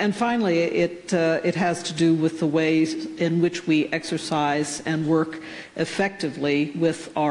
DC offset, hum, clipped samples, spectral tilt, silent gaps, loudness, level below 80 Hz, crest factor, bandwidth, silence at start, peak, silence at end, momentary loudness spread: under 0.1%; none; under 0.1%; -5.5 dB/octave; none; -23 LUFS; -64 dBFS; 14 dB; 11 kHz; 0 s; -10 dBFS; 0 s; 5 LU